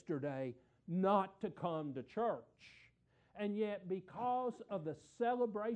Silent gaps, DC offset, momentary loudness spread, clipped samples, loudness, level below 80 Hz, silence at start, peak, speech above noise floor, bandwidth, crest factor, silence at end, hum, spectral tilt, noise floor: none; under 0.1%; 12 LU; under 0.1%; -40 LUFS; -80 dBFS; 0.05 s; -20 dBFS; 33 dB; 9.2 kHz; 20 dB; 0 s; none; -8 dB/octave; -73 dBFS